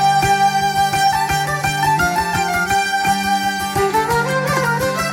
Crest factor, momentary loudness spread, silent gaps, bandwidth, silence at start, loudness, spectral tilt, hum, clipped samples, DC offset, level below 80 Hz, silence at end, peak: 12 dB; 3 LU; none; 16.5 kHz; 0 s; -16 LUFS; -3.5 dB/octave; none; under 0.1%; under 0.1%; -40 dBFS; 0 s; -4 dBFS